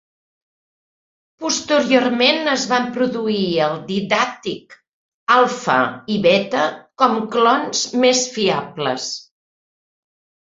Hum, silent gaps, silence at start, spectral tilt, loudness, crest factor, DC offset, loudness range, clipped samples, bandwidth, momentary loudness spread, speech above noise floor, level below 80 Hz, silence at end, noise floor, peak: none; 4.89-5.27 s; 1.4 s; -3 dB/octave; -18 LUFS; 18 dB; under 0.1%; 2 LU; under 0.1%; 8 kHz; 9 LU; over 72 dB; -62 dBFS; 1.3 s; under -90 dBFS; 0 dBFS